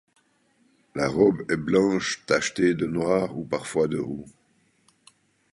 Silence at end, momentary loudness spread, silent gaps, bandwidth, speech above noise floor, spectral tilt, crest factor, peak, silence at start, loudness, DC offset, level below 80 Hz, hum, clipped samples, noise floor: 1.25 s; 9 LU; none; 11.5 kHz; 41 dB; -5 dB/octave; 20 dB; -6 dBFS; 0.95 s; -24 LUFS; under 0.1%; -58 dBFS; none; under 0.1%; -65 dBFS